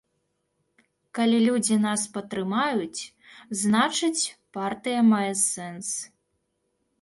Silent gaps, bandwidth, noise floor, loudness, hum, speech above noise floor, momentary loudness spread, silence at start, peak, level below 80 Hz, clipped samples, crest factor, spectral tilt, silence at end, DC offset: none; 12 kHz; -75 dBFS; -25 LUFS; none; 51 dB; 13 LU; 1.15 s; -10 dBFS; -70 dBFS; under 0.1%; 18 dB; -3.5 dB/octave; 0.95 s; under 0.1%